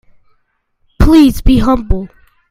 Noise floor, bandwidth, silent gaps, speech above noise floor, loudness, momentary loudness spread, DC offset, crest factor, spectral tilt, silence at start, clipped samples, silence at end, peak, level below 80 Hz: -61 dBFS; 16 kHz; none; 52 dB; -11 LUFS; 13 LU; under 0.1%; 12 dB; -7 dB/octave; 1 s; 0.3%; 0.45 s; 0 dBFS; -18 dBFS